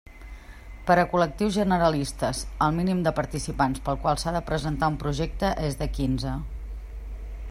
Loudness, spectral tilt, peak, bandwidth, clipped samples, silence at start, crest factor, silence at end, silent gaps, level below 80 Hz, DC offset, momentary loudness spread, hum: -26 LUFS; -6 dB/octave; -8 dBFS; 15.5 kHz; under 0.1%; 0.05 s; 18 dB; 0 s; none; -36 dBFS; under 0.1%; 17 LU; none